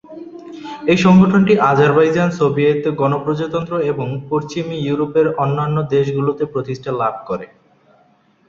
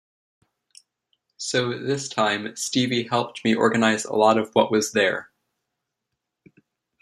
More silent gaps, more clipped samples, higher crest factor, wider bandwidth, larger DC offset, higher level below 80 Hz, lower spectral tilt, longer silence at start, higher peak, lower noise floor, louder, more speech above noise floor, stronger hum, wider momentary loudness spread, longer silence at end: neither; neither; second, 16 dB vs 22 dB; second, 7.4 kHz vs 14 kHz; neither; first, -52 dBFS vs -68 dBFS; first, -7.5 dB/octave vs -4 dB/octave; second, 0.1 s vs 1.4 s; about the same, -2 dBFS vs -2 dBFS; second, -55 dBFS vs -82 dBFS; first, -16 LUFS vs -22 LUFS; second, 39 dB vs 60 dB; neither; first, 14 LU vs 7 LU; second, 1.05 s vs 1.8 s